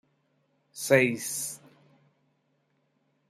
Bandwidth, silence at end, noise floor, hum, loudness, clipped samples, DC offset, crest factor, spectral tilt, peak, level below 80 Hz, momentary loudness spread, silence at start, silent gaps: 15.5 kHz; 1.75 s; -73 dBFS; none; -26 LUFS; under 0.1%; under 0.1%; 24 dB; -4 dB/octave; -8 dBFS; -74 dBFS; 22 LU; 0.75 s; none